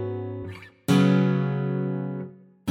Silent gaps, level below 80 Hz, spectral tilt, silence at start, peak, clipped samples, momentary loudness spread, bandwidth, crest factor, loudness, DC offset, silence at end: none; -62 dBFS; -7.5 dB/octave; 0 s; -8 dBFS; under 0.1%; 17 LU; 14.5 kHz; 16 dB; -24 LUFS; under 0.1%; 0 s